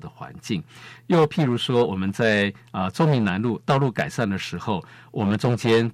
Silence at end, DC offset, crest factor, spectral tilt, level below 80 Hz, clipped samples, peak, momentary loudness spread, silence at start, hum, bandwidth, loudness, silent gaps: 0 s; under 0.1%; 14 dB; -6.5 dB/octave; -60 dBFS; under 0.1%; -8 dBFS; 10 LU; 0.05 s; none; 14 kHz; -23 LUFS; none